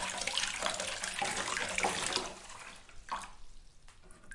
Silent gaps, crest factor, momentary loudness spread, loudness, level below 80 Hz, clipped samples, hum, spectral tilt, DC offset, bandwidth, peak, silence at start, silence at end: none; 26 dB; 16 LU; -35 LUFS; -58 dBFS; under 0.1%; none; -0.5 dB/octave; under 0.1%; 11.5 kHz; -12 dBFS; 0 s; 0 s